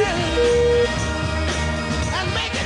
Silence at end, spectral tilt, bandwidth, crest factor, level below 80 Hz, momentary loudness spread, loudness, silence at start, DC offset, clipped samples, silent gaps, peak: 0 s; -4.5 dB/octave; 11.5 kHz; 12 dB; -32 dBFS; 6 LU; -20 LUFS; 0 s; under 0.1%; under 0.1%; none; -8 dBFS